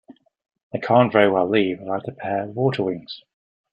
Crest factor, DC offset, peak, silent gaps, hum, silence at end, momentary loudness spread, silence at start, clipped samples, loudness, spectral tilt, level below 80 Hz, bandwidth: 20 dB; under 0.1%; -2 dBFS; 0.63-0.70 s; none; 0.55 s; 16 LU; 0.1 s; under 0.1%; -21 LUFS; -8.5 dB/octave; -64 dBFS; 9.6 kHz